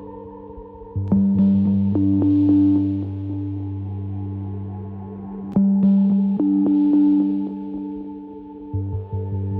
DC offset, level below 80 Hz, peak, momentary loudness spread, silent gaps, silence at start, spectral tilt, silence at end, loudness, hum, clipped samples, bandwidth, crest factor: under 0.1%; -50 dBFS; -8 dBFS; 18 LU; none; 0 s; -13 dB/octave; 0 s; -20 LUFS; none; under 0.1%; 3.5 kHz; 12 dB